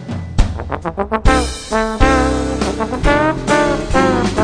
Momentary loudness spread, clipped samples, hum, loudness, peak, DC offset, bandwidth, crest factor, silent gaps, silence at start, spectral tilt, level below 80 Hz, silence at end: 7 LU; under 0.1%; none; -16 LUFS; 0 dBFS; under 0.1%; 10 kHz; 14 dB; none; 0 s; -5.5 dB/octave; -22 dBFS; 0 s